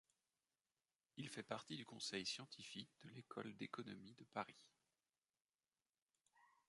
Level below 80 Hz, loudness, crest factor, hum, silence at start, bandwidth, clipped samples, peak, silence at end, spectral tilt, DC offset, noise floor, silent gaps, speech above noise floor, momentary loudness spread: -90 dBFS; -52 LUFS; 26 dB; none; 1.15 s; 11.5 kHz; under 0.1%; -30 dBFS; 0.15 s; -3.5 dB/octave; under 0.1%; under -90 dBFS; 5.41-5.49 s, 5.55-5.59 s, 6.02-6.06 s; over 37 dB; 13 LU